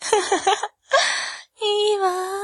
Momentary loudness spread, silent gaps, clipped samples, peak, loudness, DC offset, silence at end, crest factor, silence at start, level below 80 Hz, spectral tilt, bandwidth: 7 LU; none; under 0.1%; -2 dBFS; -21 LUFS; under 0.1%; 0 s; 18 dB; 0 s; -66 dBFS; 0 dB/octave; 12.5 kHz